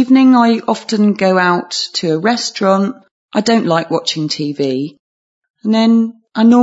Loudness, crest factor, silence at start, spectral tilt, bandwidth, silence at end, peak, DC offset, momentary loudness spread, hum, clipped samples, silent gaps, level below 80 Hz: -14 LUFS; 12 dB; 0 s; -5 dB/octave; 8 kHz; 0 s; 0 dBFS; under 0.1%; 9 LU; none; under 0.1%; 3.11-3.29 s, 4.99-5.42 s, 5.50-5.54 s; -66 dBFS